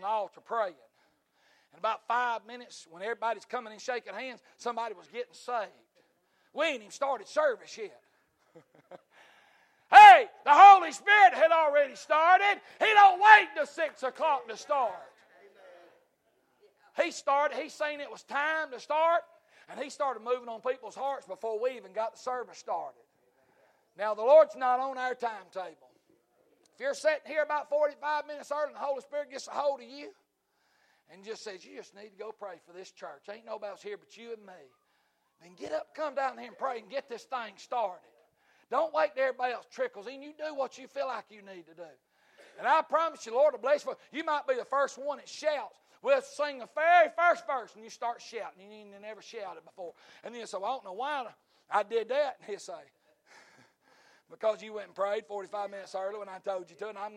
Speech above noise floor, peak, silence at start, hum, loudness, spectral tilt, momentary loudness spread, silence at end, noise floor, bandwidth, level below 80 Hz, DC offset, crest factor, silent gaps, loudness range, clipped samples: 46 dB; -4 dBFS; 0 s; none; -27 LUFS; -1.5 dB/octave; 23 LU; 0.1 s; -75 dBFS; 11 kHz; -80 dBFS; under 0.1%; 26 dB; none; 20 LU; under 0.1%